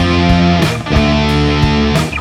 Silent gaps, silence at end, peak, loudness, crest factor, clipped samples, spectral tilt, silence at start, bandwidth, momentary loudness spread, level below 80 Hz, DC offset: none; 0 s; 0 dBFS; -12 LUFS; 10 dB; under 0.1%; -6 dB/octave; 0 s; 15 kHz; 3 LU; -20 dBFS; under 0.1%